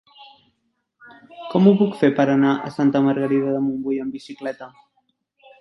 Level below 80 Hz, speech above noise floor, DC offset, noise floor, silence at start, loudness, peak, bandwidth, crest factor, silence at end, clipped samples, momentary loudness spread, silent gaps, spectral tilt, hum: -66 dBFS; 53 dB; under 0.1%; -72 dBFS; 0.2 s; -20 LUFS; -2 dBFS; 6.2 kHz; 18 dB; 0.9 s; under 0.1%; 15 LU; none; -8.5 dB/octave; none